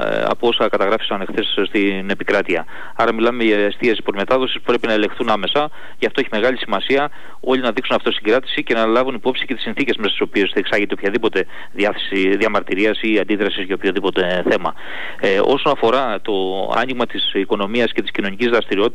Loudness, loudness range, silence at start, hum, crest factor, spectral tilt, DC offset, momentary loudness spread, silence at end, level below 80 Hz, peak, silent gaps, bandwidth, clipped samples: -18 LUFS; 1 LU; 0 s; none; 14 dB; -5.5 dB/octave; 5%; 5 LU; 0 s; -54 dBFS; -6 dBFS; none; 11.5 kHz; under 0.1%